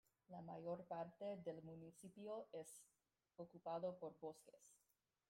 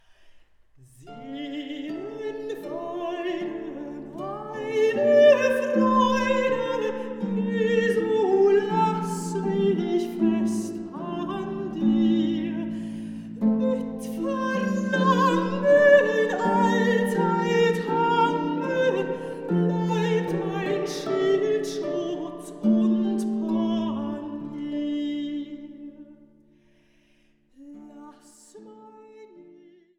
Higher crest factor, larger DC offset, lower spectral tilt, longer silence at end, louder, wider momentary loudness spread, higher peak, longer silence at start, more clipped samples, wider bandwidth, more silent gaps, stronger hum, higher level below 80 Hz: about the same, 18 dB vs 18 dB; neither; about the same, -6 dB/octave vs -6.5 dB/octave; about the same, 0.55 s vs 0.55 s; second, -54 LUFS vs -24 LUFS; about the same, 12 LU vs 14 LU; second, -36 dBFS vs -6 dBFS; about the same, 0.3 s vs 0.25 s; neither; first, 16 kHz vs 14 kHz; neither; neither; second, -90 dBFS vs -64 dBFS